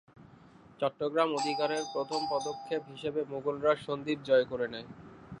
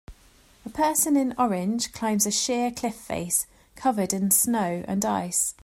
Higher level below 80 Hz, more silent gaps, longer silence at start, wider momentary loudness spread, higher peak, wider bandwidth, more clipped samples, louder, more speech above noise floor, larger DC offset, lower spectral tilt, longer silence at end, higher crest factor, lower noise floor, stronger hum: second, -68 dBFS vs -56 dBFS; neither; about the same, 0.2 s vs 0.1 s; about the same, 9 LU vs 10 LU; second, -12 dBFS vs -6 dBFS; second, 10.5 kHz vs 16 kHz; neither; second, -32 LUFS vs -24 LUFS; second, 25 dB vs 31 dB; neither; about the same, -4.5 dB/octave vs -3.5 dB/octave; about the same, 0 s vs 0.1 s; about the same, 20 dB vs 20 dB; about the same, -56 dBFS vs -56 dBFS; neither